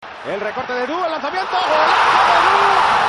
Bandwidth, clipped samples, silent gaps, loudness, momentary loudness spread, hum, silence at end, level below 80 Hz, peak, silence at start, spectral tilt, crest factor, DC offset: 11.5 kHz; under 0.1%; none; -15 LUFS; 11 LU; none; 0 s; -52 dBFS; -2 dBFS; 0 s; -2.5 dB/octave; 14 dB; under 0.1%